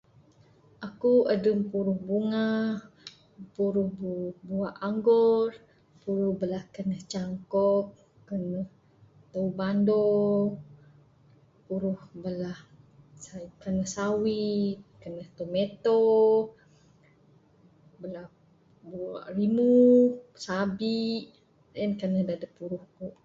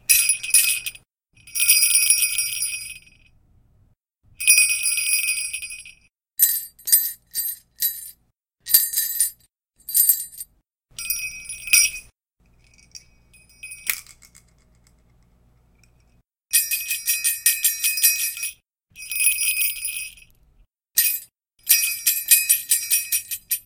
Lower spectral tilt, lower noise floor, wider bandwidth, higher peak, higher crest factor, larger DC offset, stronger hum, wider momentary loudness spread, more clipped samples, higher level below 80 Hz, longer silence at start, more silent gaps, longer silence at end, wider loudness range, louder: first, -7 dB/octave vs 4.5 dB/octave; second, -61 dBFS vs -67 dBFS; second, 7.8 kHz vs 17.5 kHz; second, -10 dBFS vs 0 dBFS; second, 18 dB vs 24 dB; neither; neither; about the same, 20 LU vs 19 LU; neither; second, -66 dBFS vs -60 dBFS; first, 0.8 s vs 0.1 s; neither; about the same, 0.15 s vs 0.05 s; about the same, 7 LU vs 8 LU; second, -27 LUFS vs -18 LUFS